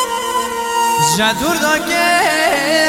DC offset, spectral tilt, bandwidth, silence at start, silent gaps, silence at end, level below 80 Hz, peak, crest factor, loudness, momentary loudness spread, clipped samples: under 0.1%; -2 dB/octave; 16.5 kHz; 0 s; none; 0 s; -46 dBFS; -2 dBFS; 14 dB; -14 LUFS; 6 LU; under 0.1%